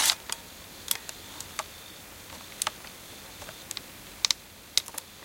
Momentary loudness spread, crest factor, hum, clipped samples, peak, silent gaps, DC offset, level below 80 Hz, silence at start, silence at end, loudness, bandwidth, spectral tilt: 17 LU; 34 dB; none; under 0.1%; -2 dBFS; none; under 0.1%; -62 dBFS; 0 s; 0 s; -32 LUFS; 17 kHz; 0.5 dB/octave